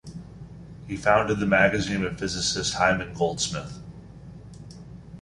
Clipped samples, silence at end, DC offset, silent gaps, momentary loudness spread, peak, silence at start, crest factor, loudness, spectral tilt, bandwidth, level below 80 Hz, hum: under 0.1%; 0 s; under 0.1%; none; 23 LU; -4 dBFS; 0.05 s; 22 dB; -24 LUFS; -4 dB/octave; 11.5 kHz; -48 dBFS; none